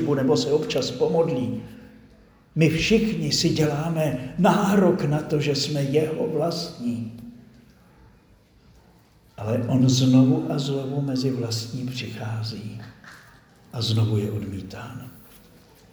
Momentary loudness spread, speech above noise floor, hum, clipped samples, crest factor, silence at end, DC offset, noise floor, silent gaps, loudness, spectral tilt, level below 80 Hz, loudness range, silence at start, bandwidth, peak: 18 LU; 33 dB; none; under 0.1%; 20 dB; 0.75 s; under 0.1%; -56 dBFS; none; -23 LUFS; -6 dB/octave; -52 dBFS; 8 LU; 0 s; over 20 kHz; -4 dBFS